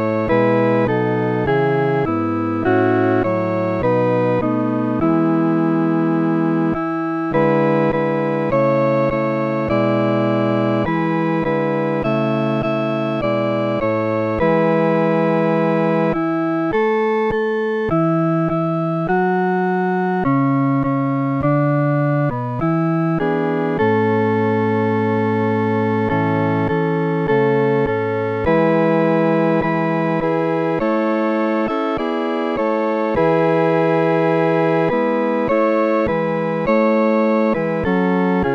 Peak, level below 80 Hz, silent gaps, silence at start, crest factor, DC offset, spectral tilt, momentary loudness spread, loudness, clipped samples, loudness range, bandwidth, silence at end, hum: -4 dBFS; -46 dBFS; none; 0 s; 12 dB; under 0.1%; -9.5 dB/octave; 4 LU; -18 LUFS; under 0.1%; 1 LU; 6.4 kHz; 0 s; none